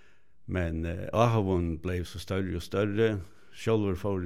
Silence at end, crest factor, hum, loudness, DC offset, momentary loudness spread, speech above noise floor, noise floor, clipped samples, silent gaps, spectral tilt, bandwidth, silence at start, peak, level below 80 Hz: 0 s; 20 dB; none; -30 LUFS; 0.5%; 10 LU; 21 dB; -50 dBFS; under 0.1%; none; -7 dB/octave; 15.5 kHz; 0 s; -8 dBFS; -50 dBFS